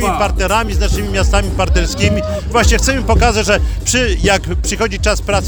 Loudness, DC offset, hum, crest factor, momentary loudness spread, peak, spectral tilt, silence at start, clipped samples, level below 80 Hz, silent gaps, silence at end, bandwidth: -14 LUFS; under 0.1%; none; 14 dB; 4 LU; 0 dBFS; -4 dB/octave; 0 s; under 0.1%; -18 dBFS; none; 0 s; over 20 kHz